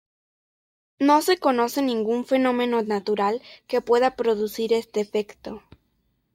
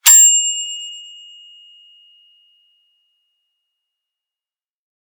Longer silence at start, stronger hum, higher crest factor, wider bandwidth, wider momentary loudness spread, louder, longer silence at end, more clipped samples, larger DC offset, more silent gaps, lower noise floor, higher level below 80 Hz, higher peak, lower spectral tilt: first, 1 s vs 0.05 s; neither; about the same, 18 dB vs 20 dB; second, 16.5 kHz vs over 20 kHz; second, 10 LU vs 27 LU; second, -23 LUFS vs -10 LUFS; second, 0.75 s vs 4.05 s; neither; neither; neither; second, -70 dBFS vs under -90 dBFS; first, -64 dBFS vs -82 dBFS; second, -6 dBFS vs 0 dBFS; first, -4.5 dB/octave vs 8 dB/octave